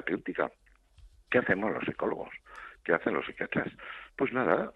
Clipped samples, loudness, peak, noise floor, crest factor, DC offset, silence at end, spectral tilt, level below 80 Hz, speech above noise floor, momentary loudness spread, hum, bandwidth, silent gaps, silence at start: under 0.1%; -31 LUFS; -10 dBFS; -58 dBFS; 22 dB; under 0.1%; 0.05 s; -8 dB/octave; -62 dBFS; 26 dB; 16 LU; none; 6.8 kHz; none; 0 s